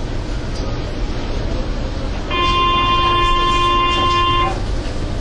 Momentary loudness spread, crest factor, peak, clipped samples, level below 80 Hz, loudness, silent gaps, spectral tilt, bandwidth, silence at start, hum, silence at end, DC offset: 10 LU; 14 dB; -2 dBFS; under 0.1%; -22 dBFS; -18 LUFS; none; -5 dB/octave; 10.5 kHz; 0 s; none; 0 s; under 0.1%